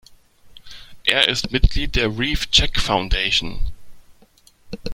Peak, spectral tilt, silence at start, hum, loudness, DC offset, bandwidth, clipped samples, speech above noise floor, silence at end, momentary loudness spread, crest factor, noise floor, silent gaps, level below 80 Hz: 0 dBFS; -3.5 dB/octave; 0.45 s; none; -19 LUFS; under 0.1%; 16 kHz; under 0.1%; 35 dB; 0 s; 18 LU; 20 dB; -53 dBFS; none; -26 dBFS